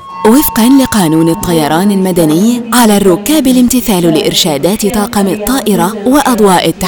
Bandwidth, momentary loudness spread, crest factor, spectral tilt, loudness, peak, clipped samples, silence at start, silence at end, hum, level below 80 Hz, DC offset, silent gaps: over 20 kHz; 4 LU; 8 dB; -4.5 dB/octave; -9 LUFS; 0 dBFS; 1%; 0 s; 0 s; none; -34 dBFS; under 0.1%; none